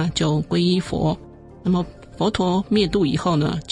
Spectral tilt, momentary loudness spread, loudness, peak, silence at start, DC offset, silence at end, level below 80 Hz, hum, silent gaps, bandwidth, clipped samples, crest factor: -6.5 dB/octave; 5 LU; -21 LUFS; -6 dBFS; 0 s; under 0.1%; 0 s; -42 dBFS; none; none; 11 kHz; under 0.1%; 16 dB